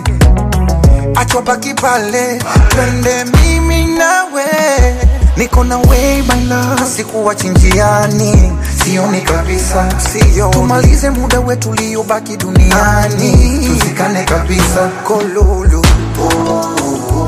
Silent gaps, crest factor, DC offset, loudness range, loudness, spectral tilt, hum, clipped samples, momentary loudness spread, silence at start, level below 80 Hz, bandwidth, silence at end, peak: none; 10 dB; under 0.1%; 1 LU; -11 LUFS; -5 dB/octave; none; under 0.1%; 5 LU; 0 s; -14 dBFS; 15.5 kHz; 0 s; 0 dBFS